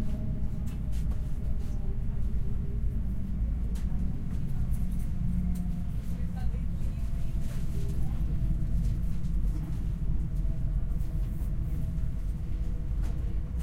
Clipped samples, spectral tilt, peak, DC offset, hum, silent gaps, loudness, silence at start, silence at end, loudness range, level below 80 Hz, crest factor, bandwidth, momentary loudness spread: under 0.1%; -8.5 dB/octave; -16 dBFS; under 0.1%; none; none; -34 LUFS; 0 s; 0 s; 1 LU; -30 dBFS; 12 dB; 12.5 kHz; 3 LU